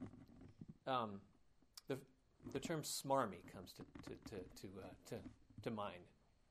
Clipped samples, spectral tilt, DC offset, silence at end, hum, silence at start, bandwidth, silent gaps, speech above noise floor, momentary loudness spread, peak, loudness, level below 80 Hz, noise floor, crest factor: under 0.1%; -4.5 dB/octave; under 0.1%; 0.35 s; none; 0 s; 15.5 kHz; none; 21 dB; 20 LU; -24 dBFS; -48 LUFS; -72 dBFS; -68 dBFS; 24 dB